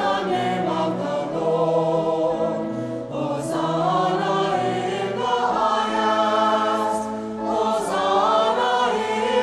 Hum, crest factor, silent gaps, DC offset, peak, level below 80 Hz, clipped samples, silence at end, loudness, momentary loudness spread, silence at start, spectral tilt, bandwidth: none; 14 dB; none; under 0.1%; -6 dBFS; -58 dBFS; under 0.1%; 0 s; -22 LUFS; 7 LU; 0 s; -5 dB/octave; 13 kHz